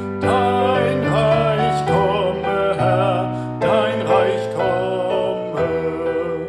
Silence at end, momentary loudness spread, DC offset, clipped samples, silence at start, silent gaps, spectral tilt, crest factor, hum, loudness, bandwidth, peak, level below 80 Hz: 0 s; 5 LU; under 0.1%; under 0.1%; 0 s; none; -7 dB/octave; 16 dB; none; -18 LUFS; 12 kHz; -2 dBFS; -46 dBFS